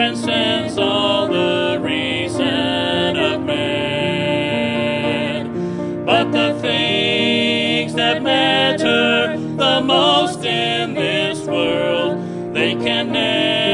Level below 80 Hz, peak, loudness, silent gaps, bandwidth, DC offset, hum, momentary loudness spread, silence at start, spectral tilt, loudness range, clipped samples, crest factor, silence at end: -56 dBFS; 0 dBFS; -17 LUFS; none; 11 kHz; under 0.1%; none; 5 LU; 0 s; -4.5 dB/octave; 3 LU; under 0.1%; 18 dB; 0 s